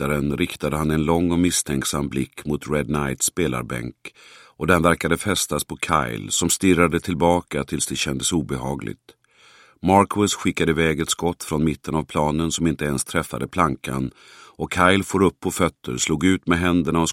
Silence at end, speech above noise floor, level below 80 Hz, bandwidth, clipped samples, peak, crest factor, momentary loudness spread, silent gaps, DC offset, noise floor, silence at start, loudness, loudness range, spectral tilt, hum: 0 s; 31 dB; -42 dBFS; 16.5 kHz; under 0.1%; 0 dBFS; 22 dB; 10 LU; none; under 0.1%; -53 dBFS; 0 s; -21 LUFS; 3 LU; -4.5 dB/octave; none